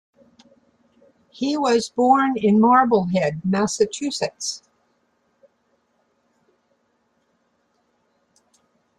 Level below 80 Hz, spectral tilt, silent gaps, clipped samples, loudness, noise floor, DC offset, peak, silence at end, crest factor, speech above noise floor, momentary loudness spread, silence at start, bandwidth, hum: -64 dBFS; -5 dB/octave; none; under 0.1%; -19 LUFS; -67 dBFS; under 0.1%; -4 dBFS; 4.4 s; 20 dB; 49 dB; 12 LU; 1.4 s; 11.5 kHz; none